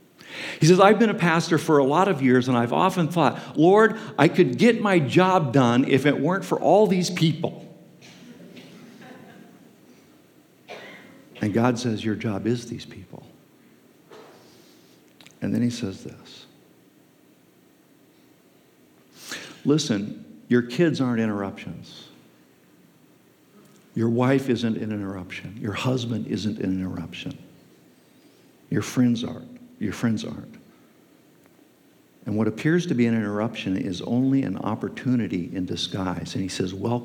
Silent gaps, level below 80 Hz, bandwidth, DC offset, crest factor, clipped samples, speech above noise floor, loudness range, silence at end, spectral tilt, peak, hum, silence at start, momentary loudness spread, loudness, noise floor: none; -72 dBFS; 17 kHz; under 0.1%; 24 dB; under 0.1%; 35 dB; 13 LU; 0 s; -6 dB/octave; -2 dBFS; none; 0.25 s; 21 LU; -23 LUFS; -57 dBFS